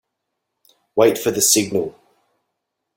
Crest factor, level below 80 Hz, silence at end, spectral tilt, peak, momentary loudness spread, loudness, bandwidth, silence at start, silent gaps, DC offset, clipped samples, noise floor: 20 dB; -62 dBFS; 1.05 s; -2.5 dB/octave; -2 dBFS; 11 LU; -17 LUFS; 17 kHz; 0.95 s; none; under 0.1%; under 0.1%; -78 dBFS